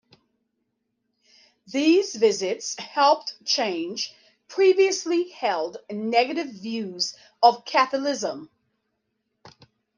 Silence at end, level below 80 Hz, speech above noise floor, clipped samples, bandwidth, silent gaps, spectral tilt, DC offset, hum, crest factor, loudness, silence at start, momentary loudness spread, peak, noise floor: 0.5 s; -80 dBFS; 54 dB; under 0.1%; 10 kHz; none; -2.5 dB/octave; under 0.1%; none; 22 dB; -23 LUFS; 1.7 s; 11 LU; -4 dBFS; -77 dBFS